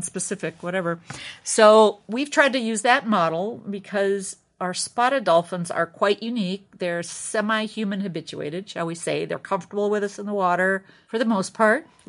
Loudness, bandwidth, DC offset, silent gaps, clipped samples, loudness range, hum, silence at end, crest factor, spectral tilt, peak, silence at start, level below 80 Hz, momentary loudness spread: -23 LUFS; 11 kHz; under 0.1%; none; under 0.1%; 7 LU; none; 0.25 s; 20 dB; -4 dB/octave; -2 dBFS; 0 s; -74 dBFS; 11 LU